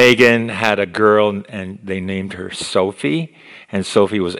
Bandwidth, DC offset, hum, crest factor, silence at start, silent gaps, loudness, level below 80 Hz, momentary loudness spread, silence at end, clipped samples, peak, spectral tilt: 19.5 kHz; under 0.1%; none; 16 dB; 0 s; none; -17 LUFS; -56 dBFS; 14 LU; 0 s; 0.2%; 0 dBFS; -5 dB/octave